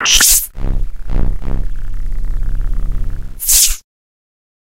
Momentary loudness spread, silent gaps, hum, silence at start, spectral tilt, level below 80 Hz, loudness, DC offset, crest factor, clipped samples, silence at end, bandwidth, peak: 18 LU; none; none; 0 s; -0.5 dB/octave; -18 dBFS; -14 LUFS; 8%; 14 dB; under 0.1%; 0.8 s; over 20 kHz; 0 dBFS